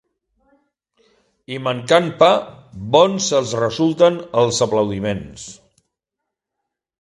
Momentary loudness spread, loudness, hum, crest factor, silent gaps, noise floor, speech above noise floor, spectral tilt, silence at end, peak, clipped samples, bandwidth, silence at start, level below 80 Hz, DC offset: 19 LU; -17 LUFS; none; 20 dB; none; -82 dBFS; 65 dB; -4.5 dB/octave; 1.45 s; 0 dBFS; under 0.1%; 11.5 kHz; 1.5 s; -52 dBFS; under 0.1%